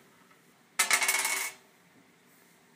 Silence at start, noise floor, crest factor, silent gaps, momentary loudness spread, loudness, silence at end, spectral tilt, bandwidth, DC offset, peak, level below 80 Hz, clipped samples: 0.8 s; -61 dBFS; 26 dB; none; 13 LU; -27 LUFS; 1.2 s; 2.5 dB/octave; 15.5 kHz; under 0.1%; -8 dBFS; -88 dBFS; under 0.1%